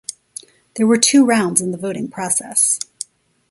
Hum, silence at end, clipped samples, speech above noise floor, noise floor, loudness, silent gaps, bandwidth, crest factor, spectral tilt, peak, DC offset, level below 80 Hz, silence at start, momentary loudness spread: none; 0.75 s; under 0.1%; 23 dB; -39 dBFS; -16 LUFS; none; 12 kHz; 18 dB; -3 dB/octave; 0 dBFS; under 0.1%; -64 dBFS; 0.1 s; 22 LU